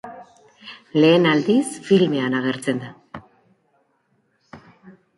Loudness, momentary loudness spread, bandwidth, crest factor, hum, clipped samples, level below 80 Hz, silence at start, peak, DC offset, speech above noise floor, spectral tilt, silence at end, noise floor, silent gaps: -19 LUFS; 25 LU; 11.5 kHz; 18 dB; none; under 0.1%; -66 dBFS; 0.05 s; -4 dBFS; under 0.1%; 48 dB; -6 dB/octave; 0.3 s; -66 dBFS; none